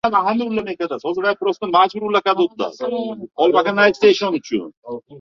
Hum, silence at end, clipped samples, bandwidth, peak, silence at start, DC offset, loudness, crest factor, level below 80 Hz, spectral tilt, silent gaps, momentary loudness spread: none; 0 s; under 0.1%; 7.2 kHz; -2 dBFS; 0.05 s; under 0.1%; -18 LUFS; 16 dB; -62 dBFS; -5 dB/octave; 4.77-4.82 s; 11 LU